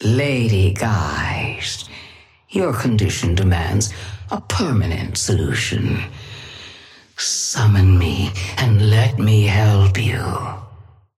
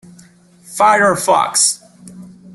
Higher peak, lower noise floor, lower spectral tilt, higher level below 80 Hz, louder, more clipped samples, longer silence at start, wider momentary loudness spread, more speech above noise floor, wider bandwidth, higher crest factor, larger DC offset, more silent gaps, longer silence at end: second, -4 dBFS vs 0 dBFS; about the same, -44 dBFS vs -46 dBFS; first, -5 dB/octave vs -1.5 dB/octave; first, -36 dBFS vs -60 dBFS; second, -18 LUFS vs -13 LUFS; neither; second, 0 s vs 0.7 s; first, 17 LU vs 12 LU; second, 28 dB vs 33 dB; first, 14 kHz vs 12.5 kHz; about the same, 14 dB vs 16 dB; neither; neither; about the same, 0.35 s vs 0.3 s